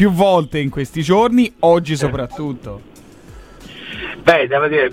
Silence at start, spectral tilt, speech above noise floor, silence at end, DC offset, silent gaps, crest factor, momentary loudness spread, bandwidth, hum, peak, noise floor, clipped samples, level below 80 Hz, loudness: 0 s; -6 dB/octave; 24 dB; 0 s; under 0.1%; none; 16 dB; 18 LU; 16 kHz; none; 0 dBFS; -39 dBFS; under 0.1%; -42 dBFS; -16 LUFS